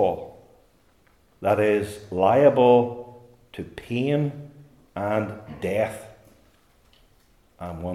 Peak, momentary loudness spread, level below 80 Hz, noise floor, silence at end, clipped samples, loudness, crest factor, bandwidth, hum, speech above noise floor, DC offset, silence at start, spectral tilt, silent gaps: -4 dBFS; 22 LU; -60 dBFS; -60 dBFS; 0 s; under 0.1%; -23 LUFS; 20 dB; 14.5 kHz; none; 38 dB; under 0.1%; 0 s; -7.5 dB/octave; none